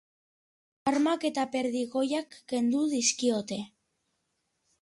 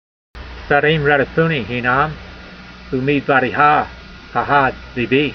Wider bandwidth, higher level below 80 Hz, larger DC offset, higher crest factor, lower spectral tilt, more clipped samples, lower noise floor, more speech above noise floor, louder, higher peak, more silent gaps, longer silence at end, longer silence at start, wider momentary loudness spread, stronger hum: first, 11.5 kHz vs 6.4 kHz; second, -74 dBFS vs -40 dBFS; neither; about the same, 18 dB vs 18 dB; second, -3 dB/octave vs -7.5 dB/octave; neither; first, -79 dBFS vs -36 dBFS; first, 50 dB vs 21 dB; second, -29 LUFS vs -16 LUFS; second, -14 dBFS vs 0 dBFS; neither; first, 1.15 s vs 0 s; first, 0.85 s vs 0.35 s; second, 9 LU vs 22 LU; neither